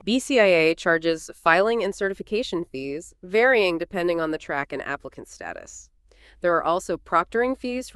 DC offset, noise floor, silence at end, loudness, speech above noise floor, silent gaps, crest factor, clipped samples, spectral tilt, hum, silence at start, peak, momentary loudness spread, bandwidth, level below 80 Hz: under 0.1%; -54 dBFS; 0.05 s; -23 LUFS; 31 dB; none; 22 dB; under 0.1%; -4 dB/octave; none; 0.05 s; -2 dBFS; 17 LU; 13 kHz; -54 dBFS